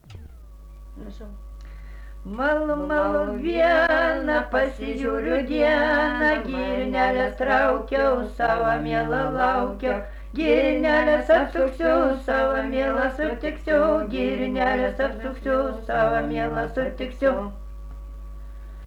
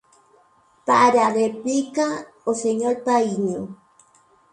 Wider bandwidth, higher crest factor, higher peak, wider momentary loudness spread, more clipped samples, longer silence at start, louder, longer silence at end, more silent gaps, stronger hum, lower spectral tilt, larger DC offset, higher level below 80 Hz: about the same, 12 kHz vs 11 kHz; about the same, 16 dB vs 18 dB; second, -8 dBFS vs -4 dBFS; first, 21 LU vs 12 LU; neither; second, 0.1 s vs 0.85 s; about the same, -22 LUFS vs -21 LUFS; second, 0 s vs 0.8 s; neither; neither; first, -6.5 dB/octave vs -4.5 dB/octave; neither; first, -38 dBFS vs -68 dBFS